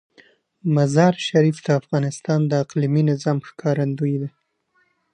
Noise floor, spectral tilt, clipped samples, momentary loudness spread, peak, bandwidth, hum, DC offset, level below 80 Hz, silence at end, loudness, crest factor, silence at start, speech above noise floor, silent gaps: -66 dBFS; -7 dB/octave; under 0.1%; 7 LU; -2 dBFS; 10 kHz; none; under 0.1%; -66 dBFS; 0.85 s; -20 LUFS; 18 dB; 0.65 s; 46 dB; none